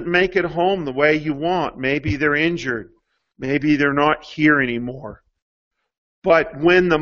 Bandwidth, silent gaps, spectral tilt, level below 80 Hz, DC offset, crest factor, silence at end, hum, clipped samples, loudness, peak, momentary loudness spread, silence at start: 7.2 kHz; 5.42-5.71 s, 5.98-6.22 s; -6.5 dB/octave; -46 dBFS; under 0.1%; 18 dB; 0 s; none; under 0.1%; -19 LUFS; -2 dBFS; 11 LU; 0 s